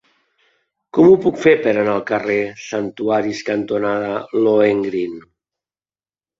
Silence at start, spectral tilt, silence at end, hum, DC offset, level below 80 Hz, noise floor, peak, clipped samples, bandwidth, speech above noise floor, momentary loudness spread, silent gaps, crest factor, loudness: 0.95 s; -6.5 dB/octave; 1.2 s; none; under 0.1%; -58 dBFS; under -90 dBFS; -2 dBFS; under 0.1%; 7.6 kHz; over 74 dB; 12 LU; none; 16 dB; -17 LUFS